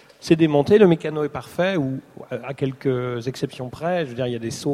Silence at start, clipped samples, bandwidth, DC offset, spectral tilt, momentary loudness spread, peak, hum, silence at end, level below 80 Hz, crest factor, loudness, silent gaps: 0.2 s; under 0.1%; 14.5 kHz; under 0.1%; -6.5 dB/octave; 14 LU; -2 dBFS; none; 0 s; -56 dBFS; 20 dB; -21 LUFS; none